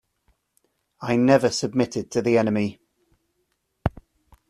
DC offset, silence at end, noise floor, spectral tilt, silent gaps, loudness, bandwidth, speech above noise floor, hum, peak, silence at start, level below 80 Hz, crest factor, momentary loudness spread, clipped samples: under 0.1%; 0.6 s; -73 dBFS; -5.5 dB/octave; none; -22 LUFS; 13.5 kHz; 52 dB; none; -4 dBFS; 1 s; -48 dBFS; 20 dB; 12 LU; under 0.1%